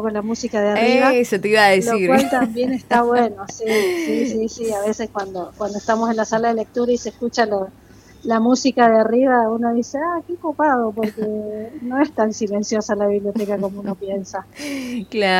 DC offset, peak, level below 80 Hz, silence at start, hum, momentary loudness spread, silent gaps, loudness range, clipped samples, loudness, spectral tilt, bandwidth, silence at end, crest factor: under 0.1%; -4 dBFS; -54 dBFS; 0 s; none; 12 LU; none; 5 LU; under 0.1%; -19 LUFS; -4.5 dB/octave; 16.5 kHz; 0 s; 16 dB